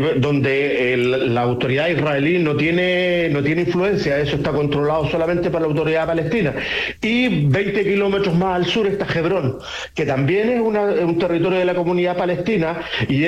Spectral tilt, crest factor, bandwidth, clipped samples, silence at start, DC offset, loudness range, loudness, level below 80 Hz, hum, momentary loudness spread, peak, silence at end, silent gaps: -7 dB/octave; 10 dB; 11.5 kHz; under 0.1%; 0 s; under 0.1%; 1 LU; -18 LUFS; -46 dBFS; none; 3 LU; -8 dBFS; 0 s; none